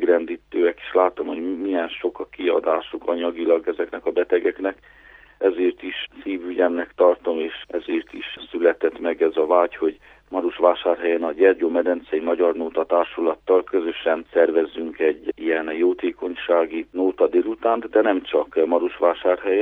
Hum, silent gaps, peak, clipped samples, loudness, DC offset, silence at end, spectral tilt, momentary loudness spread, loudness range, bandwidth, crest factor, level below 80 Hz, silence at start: none; none; -2 dBFS; under 0.1%; -22 LUFS; under 0.1%; 0 s; -6.5 dB/octave; 9 LU; 3 LU; 4.4 kHz; 18 dB; -60 dBFS; 0 s